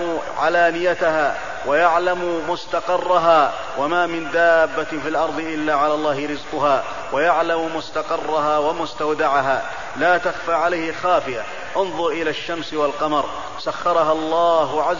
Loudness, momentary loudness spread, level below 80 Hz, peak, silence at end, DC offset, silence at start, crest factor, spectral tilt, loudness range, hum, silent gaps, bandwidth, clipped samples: -20 LUFS; 8 LU; -52 dBFS; -4 dBFS; 0 s; 2%; 0 s; 16 dB; -4.5 dB/octave; 3 LU; none; none; 7.4 kHz; under 0.1%